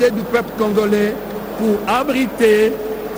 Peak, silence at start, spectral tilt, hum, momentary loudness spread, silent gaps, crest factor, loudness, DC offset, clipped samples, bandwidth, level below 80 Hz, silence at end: -2 dBFS; 0 s; -5.5 dB/octave; none; 8 LU; none; 14 dB; -17 LUFS; under 0.1%; under 0.1%; over 20 kHz; -44 dBFS; 0 s